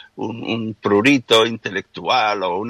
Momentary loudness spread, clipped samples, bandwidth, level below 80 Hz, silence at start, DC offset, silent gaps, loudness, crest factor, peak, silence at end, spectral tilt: 12 LU; under 0.1%; 15.5 kHz; -62 dBFS; 0.15 s; under 0.1%; none; -18 LUFS; 16 dB; -4 dBFS; 0 s; -4.5 dB/octave